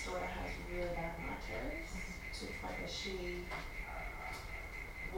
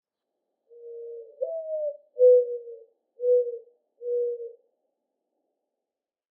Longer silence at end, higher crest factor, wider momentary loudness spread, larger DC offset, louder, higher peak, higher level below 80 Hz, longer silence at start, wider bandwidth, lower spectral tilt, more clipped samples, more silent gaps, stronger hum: second, 0 s vs 1.85 s; about the same, 16 dB vs 18 dB; second, 4 LU vs 24 LU; neither; second, -43 LUFS vs -25 LUFS; second, -26 dBFS vs -10 dBFS; first, -48 dBFS vs under -90 dBFS; second, 0 s vs 0.8 s; first, over 20 kHz vs 0.8 kHz; second, -4.5 dB/octave vs -6.5 dB/octave; neither; neither; neither